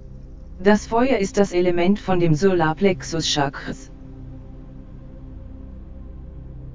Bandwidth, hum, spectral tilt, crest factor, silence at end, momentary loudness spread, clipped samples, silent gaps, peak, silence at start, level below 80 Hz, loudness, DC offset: 7.6 kHz; none; -5.5 dB/octave; 20 dB; 0 s; 23 LU; under 0.1%; none; -2 dBFS; 0 s; -40 dBFS; -20 LUFS; under 0.1%